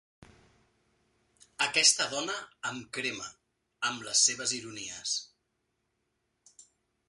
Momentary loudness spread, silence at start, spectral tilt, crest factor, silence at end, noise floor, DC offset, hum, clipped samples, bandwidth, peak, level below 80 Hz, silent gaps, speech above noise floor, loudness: 15 LU; 0.2 s; 0.5 dB/octave; 26 dB; 0.45 s; -80 dBFS; under 0.1%; none; under 0.1%; 11.5 kHz; -8 dBFS; -74 dBFS; none; 48 dB; -29 LUFS